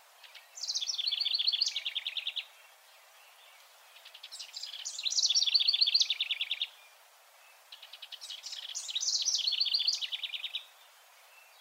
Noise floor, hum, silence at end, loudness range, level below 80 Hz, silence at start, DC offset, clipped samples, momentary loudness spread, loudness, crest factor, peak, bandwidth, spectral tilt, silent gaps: -60 dBFS; none; 0.2 s; 7 LU; under -90 dBFS; 0.2 s; under 0.1%; under 0.1%; 21 LU; -30 LUFS; 22 dB; -14 dBFS; 16 kHz; 10 dB/octave; none